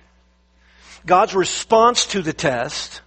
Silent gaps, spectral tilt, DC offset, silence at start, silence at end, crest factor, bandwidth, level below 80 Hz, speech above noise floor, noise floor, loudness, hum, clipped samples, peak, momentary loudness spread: none; -3 dB/octave; under 0.1%; 0.9 s; 0.05 s; 18 dB; 8.8 kHz; -52 dBFS; 39 dB; -57 dBFS; -17 LUFS; none; under 0.1%; 0 dBFS; 10 LU